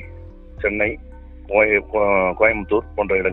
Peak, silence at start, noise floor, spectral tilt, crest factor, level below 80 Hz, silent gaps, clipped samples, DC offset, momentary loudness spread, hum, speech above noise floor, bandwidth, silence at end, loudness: -2 dBFS; 0 s; -38 dBFS; -9.5 dB/octave; 18 dB; -38 dBFS; none; under 0.1%; under 0.1%; 8 LU; none; 19 dB; 4 kHz; 0 s; -19 LUFS